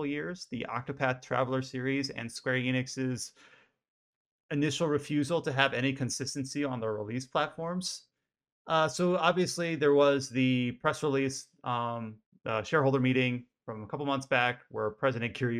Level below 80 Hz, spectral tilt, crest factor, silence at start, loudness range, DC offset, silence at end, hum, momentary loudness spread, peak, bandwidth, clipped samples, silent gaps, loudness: -70 dBFS; -5 dB/octave; 22 dB; 0 s; 5 LU; under 0.1%; 0 s; none; 10 LU; -8 dBFS; 14.5 kHz; under 0.1%; 3.88-4.49 s, 8.52-8.65 s, 12.26-12.32 s; -31 LUFS